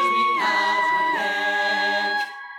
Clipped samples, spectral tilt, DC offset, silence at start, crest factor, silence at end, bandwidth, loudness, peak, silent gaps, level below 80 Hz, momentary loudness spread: under 0.1%; -2 dB/octave; under 0.1%; 0 s; 12 dB; 0 s; 17.5 kHz; -21 LUFS; -10 dBFS; none; under -90 dBFS; 3 LU